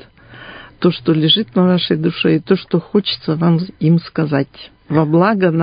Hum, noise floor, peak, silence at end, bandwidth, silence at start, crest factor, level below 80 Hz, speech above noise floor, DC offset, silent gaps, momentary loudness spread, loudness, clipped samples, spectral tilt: none; -38 dBFS; 0 dBFS; 0 s; 5.2 kHz; 0.3 s; 16 dB; -52 dBFS; 24 dB; under 0.1%; none; 7 LU; -15 LUFS; under 0.1%; -12 dB/octave